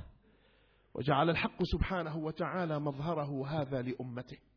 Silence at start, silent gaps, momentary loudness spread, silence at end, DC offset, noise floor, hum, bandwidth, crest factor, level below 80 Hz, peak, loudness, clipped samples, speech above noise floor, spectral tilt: 0 s; none; 11 LU; 0.2 s; under 0.1%; -68 dBFS; none; 5.4 kHz; 20 dB; -48 dBFS; -14 dBFS; -35 LUFS; under 0.1%; 33 dB; -5.5 dB/octave